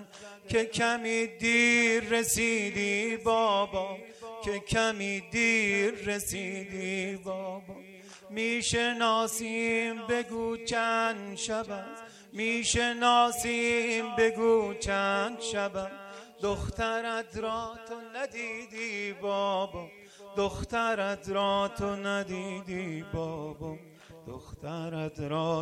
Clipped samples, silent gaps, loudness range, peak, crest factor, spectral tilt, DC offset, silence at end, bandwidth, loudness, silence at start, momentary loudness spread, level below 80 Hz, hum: under 0.1%; none; 8 LU; -12 dBFS; 20 dB; -3.5 dB/octave; under 0.1%; 0 s; 16.5 kHz; -29 LUFS; 0 s; 15 LU; -54 dBFS; none